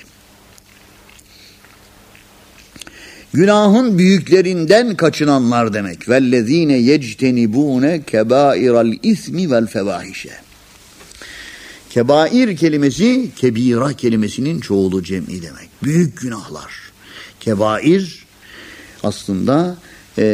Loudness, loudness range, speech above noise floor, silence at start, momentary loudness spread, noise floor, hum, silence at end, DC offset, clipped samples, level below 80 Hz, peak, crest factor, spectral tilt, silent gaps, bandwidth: -15 LUFS; 7 LU; 31 dB; 3 s; 22 LU; -45 dBFS; none; 0 s; under 0.1%; under 0.1%; -52 dBFS; 0 dBFS; 16 dB; -6 dB/octave; none; 15.5 kHz